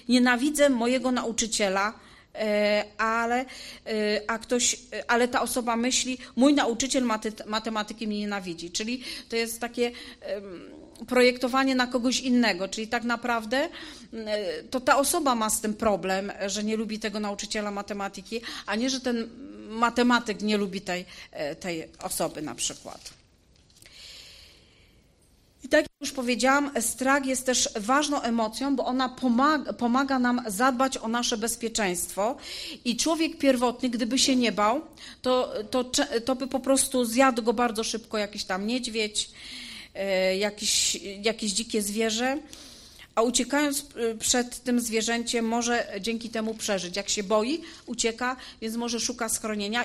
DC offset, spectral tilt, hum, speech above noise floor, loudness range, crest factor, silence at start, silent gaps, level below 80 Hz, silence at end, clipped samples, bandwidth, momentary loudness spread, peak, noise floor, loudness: under 0.1%; -2.5 dB/octave; none; 34 dB; 5 LU; 20 dB; 0.1 s; none; -56 dBFS; 0 s; under 0.1%; 15.5 kHz; 12 LU; -6 dBFS; -61 dBFS; -26 LUFS